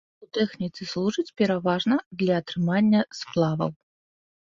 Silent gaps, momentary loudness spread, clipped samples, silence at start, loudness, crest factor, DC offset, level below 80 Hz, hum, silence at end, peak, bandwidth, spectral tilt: 2.06-2.11 s; 8 LU; under 0.1%; 0.2 s; -25 LUFS; 16 dB; under 0.1%; -64 dBFS; none; 0.85 s; -10 dBFS; 7.4 kHz; -6.5 dB/octave